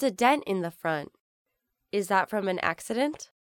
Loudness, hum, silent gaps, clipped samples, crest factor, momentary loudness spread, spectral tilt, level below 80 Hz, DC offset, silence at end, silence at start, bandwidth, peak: -28 LUFS; none; 1.20-1.45 s; under 0.1%; 20 dB; 9 LU; -4.5 dB/octave; -70 dBFS; under 0.1%; 0.2 s; 0 s; 19 kHz; -8 dBFS